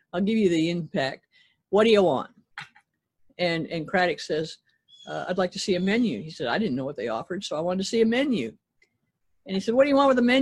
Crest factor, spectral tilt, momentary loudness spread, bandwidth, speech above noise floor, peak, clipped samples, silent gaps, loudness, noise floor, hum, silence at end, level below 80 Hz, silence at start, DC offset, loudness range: 18 dB; -5.5 dB/octave; 14 LU; 11.5 kHz; 50 dB; -8 dBFS; under 0.1%; none; -25 LUFS; -74 dBFS; none; 0 s; -62 dBFS; 0.15 s; under 0.1%; 3 LU